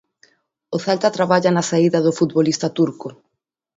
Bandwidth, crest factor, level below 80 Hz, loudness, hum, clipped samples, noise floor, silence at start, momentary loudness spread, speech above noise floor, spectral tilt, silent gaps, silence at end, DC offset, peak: 8 kHz; 18 dB; -64 dBFS; -18 LUFS; none; under 0.1%; -58 dBFS; 0.7 s; 10 LU; 40 dB; -5.5 dB/octave; none; 0.65 s; under 0.1%; 0 dBFS